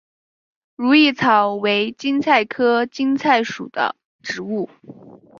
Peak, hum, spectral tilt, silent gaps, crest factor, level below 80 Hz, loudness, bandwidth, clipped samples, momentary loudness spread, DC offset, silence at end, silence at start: -2 dBFS; none; -4.5 dB/octave; 4.05-4.19 s; 18 dB; -66 dBFS; -18 LUFS; 7.2 kHz; under 0.1%; 13 LU; under 0.1%; 0.25 s; 0.8 s